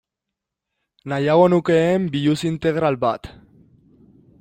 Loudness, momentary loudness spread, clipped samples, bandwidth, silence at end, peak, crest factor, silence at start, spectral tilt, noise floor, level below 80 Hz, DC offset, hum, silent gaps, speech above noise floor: -19 LUFS; 11 LU; under 0.1%; 15.5 kHz; 1.1 s; -2 dBFS; 18 dB; 1.05 s; -7 dB/octave; -83 dBFS; -54 dBFS; under 0.1%; none; none; 65 dB